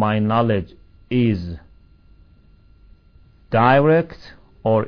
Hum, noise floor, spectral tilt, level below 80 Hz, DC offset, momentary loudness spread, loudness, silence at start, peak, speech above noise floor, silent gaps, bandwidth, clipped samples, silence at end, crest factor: none; -51 dBFS; -9.5 dB/octave; -46 dBFS; under 0.1%; 18 LU; -18 LUFS; 0 s; -2 dBFS; 33 dB; none; 5.4 kHz; under 0.1%; 0 s; 18 dB